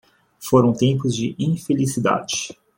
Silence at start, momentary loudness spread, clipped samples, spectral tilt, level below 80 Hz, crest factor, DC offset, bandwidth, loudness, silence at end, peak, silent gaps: 0.4 s; 8 LU; under 0.1%; -5.5 dB/octave; -56 dBFS; 18 dB; under 0.1%; 16.5 kHz; -20 LUFS; 0.25 s; -2 dBFS; none